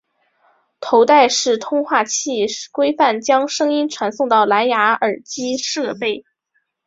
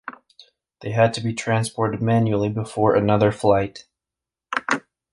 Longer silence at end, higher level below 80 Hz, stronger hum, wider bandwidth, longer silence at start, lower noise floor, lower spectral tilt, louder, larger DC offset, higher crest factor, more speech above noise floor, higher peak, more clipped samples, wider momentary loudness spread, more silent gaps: first, 0.65 s vs 0.35 s; second, -66 dBFS vs -50 dBFS; neither; second, 7.8 kHz vs 11.5 kHz; first, 0.8 s vs 0.05 s; second, -68 dBFS vs -88 dBFS; second, -2 dB/octave vs -6.5 dB/octave; first, -17 LUFS vs -21 LUFS; neither; about the same, 16 dB vs 18 dB; second, 52 dB vs 68 dB; about the same, -2 dBFS vs -2 dBFS; neither; about the same, 10 LU vs 10 LU; neither